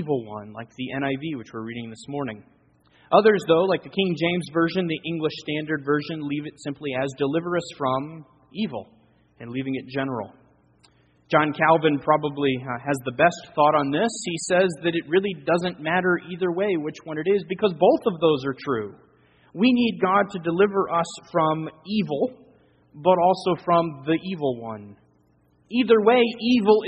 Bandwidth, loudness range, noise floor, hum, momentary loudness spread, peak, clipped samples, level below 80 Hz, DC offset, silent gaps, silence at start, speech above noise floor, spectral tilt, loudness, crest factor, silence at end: 8.2 kHz; 6 LU; -62 dBFS; none; 14 LU; -2 dBFS; under 0.1%; -64 dBFS; under 0.1%; none; 0 s; 39 dB; -5.5 dB/octave; -23 LUFS; 22 dB; 0 s